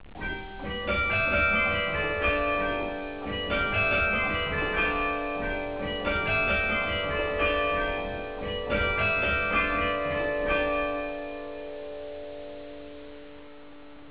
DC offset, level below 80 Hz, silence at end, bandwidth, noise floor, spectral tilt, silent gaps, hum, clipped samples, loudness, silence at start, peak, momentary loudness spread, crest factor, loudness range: 0.4%; -42 dBFS; 0 s; 4 kHz; -48 dBFS; -2.5 dB/octave; none; none; under 0.1%; -26 LUFS; 0 s; -14 dBFS; 15 LU; 16 dB; 6 LU